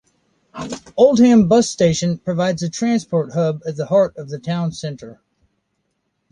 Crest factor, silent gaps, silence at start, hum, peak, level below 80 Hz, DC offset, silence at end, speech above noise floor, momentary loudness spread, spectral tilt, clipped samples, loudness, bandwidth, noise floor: 16 dB; none; 0.55 s; none; -2 dBFS; -52 dBFS; under 0.1%; 1.2 s; 54 dB; 17 LU; -6 dB/octave; under 0.1%; -17 LUFS; 10.5 kHz; -71 dBFS